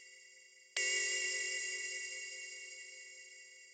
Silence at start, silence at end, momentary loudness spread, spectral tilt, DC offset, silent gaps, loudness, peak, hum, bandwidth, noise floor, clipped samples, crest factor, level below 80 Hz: 0 s; 0 s; 22 LU; 3.5 dB/octave; under 0.1%; none; -37 LUFS; -22 dBFS; none; 16 kHz; -62 dBFS; under 0.1%; 20 dB; -88 dBFS